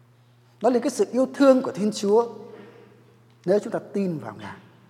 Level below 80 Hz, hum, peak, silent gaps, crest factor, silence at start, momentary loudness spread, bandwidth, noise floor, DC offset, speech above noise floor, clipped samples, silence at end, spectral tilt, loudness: -80 dBFS; 60 Hz at -55 dBFS; -6 dBFS; none; 20 dB; 0.6 s; 20 LU; 14 kHz; -56 dBFS; under 0.1%; 34 dB; under 0.1%; 0.3 s; -6 dB/octave; -23 LUFS